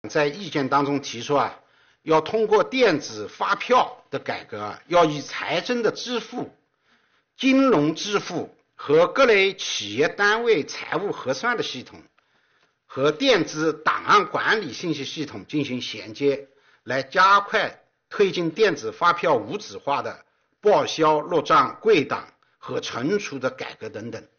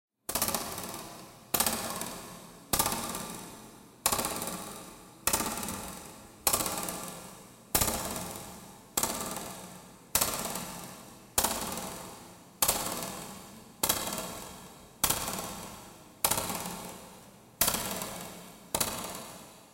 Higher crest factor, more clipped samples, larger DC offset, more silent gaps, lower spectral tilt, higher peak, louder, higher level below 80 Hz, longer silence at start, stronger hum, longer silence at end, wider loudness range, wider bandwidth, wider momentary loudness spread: second, 16 dB vs 26 dB; neither; neither; neither; about the same, -2.5 dB/octave vs -1.5 dB/octave; about the same, -8 dBFS vs -10 dBFS; first, -22 LUFS vs -32 LUFS; second, -64 dBFS vs -54 dBFS; second, 0.05 s vs 0.3 s; neither; first, 0.2 s vs 0 s; about the same, 4 LU vs 2 LU; second, 6.8 kHz vs 17 kHz; second, 14 LU vs 20 LU